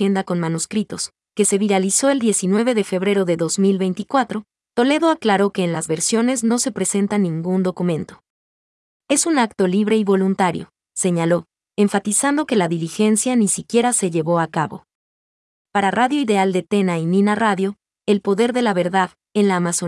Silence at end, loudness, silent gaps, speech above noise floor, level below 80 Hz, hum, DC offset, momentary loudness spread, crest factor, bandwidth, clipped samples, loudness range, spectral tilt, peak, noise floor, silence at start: 0 s; -19 LUFS; 8.30-9.00 s, 14.95-15.65 s; over 72 dB; -66 dBFS; none; under 0.1%; 7 LU; 14 dB; 12 kHz; under 0.1%; 2 LU; -4.5 dB/octave; -4 dBFS; under -90 dBFS; 0 s